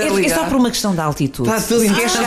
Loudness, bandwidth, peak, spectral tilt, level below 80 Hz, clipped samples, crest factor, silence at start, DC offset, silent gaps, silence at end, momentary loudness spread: -16 LUFS; 15.5 kHz; -4 dBFS; -4 dB/octave; -40 dBFS; under 0.1%; 12 dB; 0 s; under 0.1%; none; 0 s; 4 LU